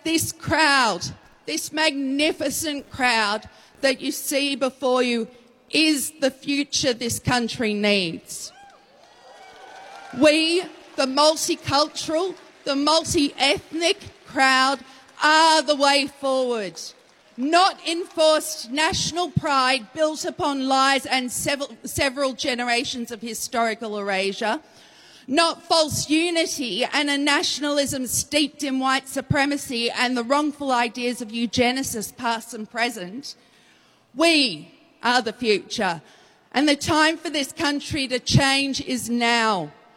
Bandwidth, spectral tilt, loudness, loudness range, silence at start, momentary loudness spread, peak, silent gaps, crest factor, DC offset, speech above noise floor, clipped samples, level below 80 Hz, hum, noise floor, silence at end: 16.5 kHz; -3 dB/octave; -21 LUFS; 4 LU; 0.05 s; 10 LU; -6 dBFS; none; 18 dB; under 0.1%; 35 dB; under 0.1%; -54 dBFS; none; -57 dBFS; 0.25 s